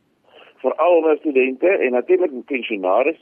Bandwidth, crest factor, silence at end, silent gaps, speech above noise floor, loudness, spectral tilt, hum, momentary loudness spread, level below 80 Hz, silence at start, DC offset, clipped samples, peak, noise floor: 3.5 kHz; 12 dB; 0.1 s; none; 32 dB; -18 LUFS; -7.5 dB/octave; none; 8 LU; -74 dBFS; 0.65 s; under 0.1%; under 0.1%; -6 dBFS; -50 dBFS